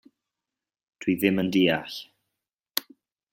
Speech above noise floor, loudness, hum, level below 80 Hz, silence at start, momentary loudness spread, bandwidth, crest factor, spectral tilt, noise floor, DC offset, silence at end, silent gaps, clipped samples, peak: 66 dB; -25 LUFS; none; -66 dBFS; 1 s; 12 LU; 16.5 kHz; 28 dB; -5 dB/octave; -89 dBFS; under 0.1%; 0.5 s; 2.54-2.58 s; under 0.1%; 0 dBFS